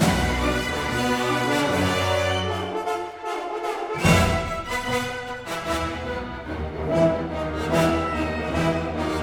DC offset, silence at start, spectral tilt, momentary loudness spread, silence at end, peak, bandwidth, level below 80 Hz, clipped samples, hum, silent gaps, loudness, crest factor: under 0.1%; 0 s; -5 dB/octave; 9 LU; 0 s; -6 dBFS; over 20 kHz; -36 dBFS; under 0.1%; none; none; -24 LUFS; 18 dB